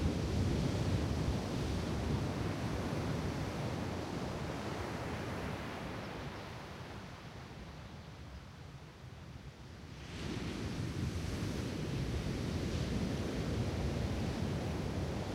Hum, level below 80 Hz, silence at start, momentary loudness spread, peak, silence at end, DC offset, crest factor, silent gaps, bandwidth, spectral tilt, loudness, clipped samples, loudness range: none; -46 dBFS; 0 s; 15 LU; -22 dBFS; 0 s; under 0.1%; 16 dB; none; 16 kHz; -6 dB/octave; -39 LUFS; under 0.1%; 11 LU